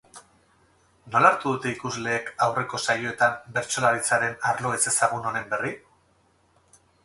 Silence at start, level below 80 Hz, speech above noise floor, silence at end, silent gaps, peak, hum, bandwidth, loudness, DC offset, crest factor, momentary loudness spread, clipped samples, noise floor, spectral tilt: 0.15 s; -64 dBFS; 39 dB; 1.25 s; none; -2 dBFS; none; 12 kHz; -24 LUFS; under 0.1%; 24 dB; 9 LU; under 0.1%; -64 dBFS; -3 dB/octave